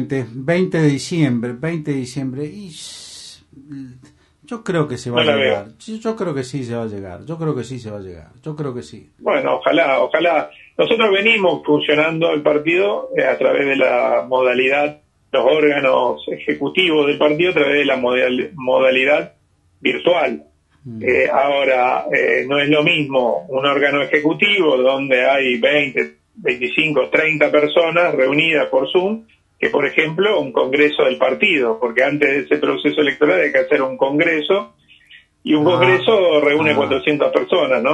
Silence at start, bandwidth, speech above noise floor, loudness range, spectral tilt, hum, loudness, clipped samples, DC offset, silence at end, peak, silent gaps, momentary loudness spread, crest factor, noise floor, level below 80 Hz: 0 s; 11.5 kHz; 31 dB; 6 LU; -5.5 dB/octave; none; -16 LUFS; under 0.1%; under 0.1%; 0 s; 0 dBFS; none; 13 LU; 16 dB; -48 dBFS; -60 dBFS